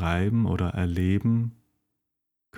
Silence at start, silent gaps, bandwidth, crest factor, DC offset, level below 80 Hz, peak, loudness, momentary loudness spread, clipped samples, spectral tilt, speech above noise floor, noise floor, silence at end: 0 s; none; 11.5 kHz; 16 dB; under 0.1%; -44 dBFS; -10 dBFS; -26 LUFS; 3 LU; under 0.1%; -8.5 dB/octave; 58 dB; -83 dBFS; 0 s